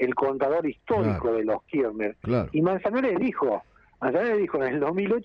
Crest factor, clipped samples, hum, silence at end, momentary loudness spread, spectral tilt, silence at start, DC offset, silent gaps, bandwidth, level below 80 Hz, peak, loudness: 12 dB; under 0.1%; none; 0 s; 4 LU; -9.5 dB/octave; 0 s; under 0.1%; none; 5.8 kHz; -52 dBFS; -12 dBFS; -26 LUFS